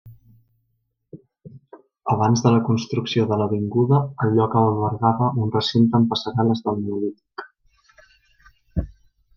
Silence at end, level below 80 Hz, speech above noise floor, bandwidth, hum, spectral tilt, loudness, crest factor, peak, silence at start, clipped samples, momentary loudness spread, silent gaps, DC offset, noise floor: 0.45 s; -46 dBFS; 53 dB; 7 kHz; none; -7 dB/octave; -21 LUFS; 18 dB; -4 dBFS; 0.05 s; under 0.1%; 12 LU; none; under 0.1%; -72 dBFS